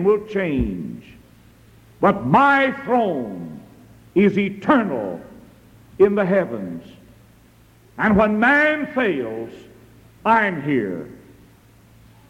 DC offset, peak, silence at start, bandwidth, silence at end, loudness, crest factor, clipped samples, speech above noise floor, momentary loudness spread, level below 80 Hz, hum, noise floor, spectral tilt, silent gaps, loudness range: under 0.1%; -4 dBFS; 0 s; 12.5 kHz; 1.15 s; -19 LUFS; 18 dB; under 0.1%; 32 dB; 19 LU; -46 dBFS; none; -51 dBFS; -7.5 dB/octave; none; 4 LU